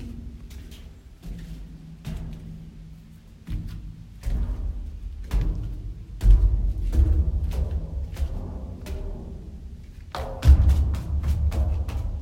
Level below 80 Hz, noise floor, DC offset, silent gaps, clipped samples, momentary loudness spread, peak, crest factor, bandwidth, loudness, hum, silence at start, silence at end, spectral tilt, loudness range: -26 dBFS; -46 dBFS; under 0.1%; none; under 0.1%; 21 LU; -4 dBFS; 20 dB; 8.8 kHz; -26 LUFS; none; 0 s; 0 s; -7.5 dB/octave; 14 LU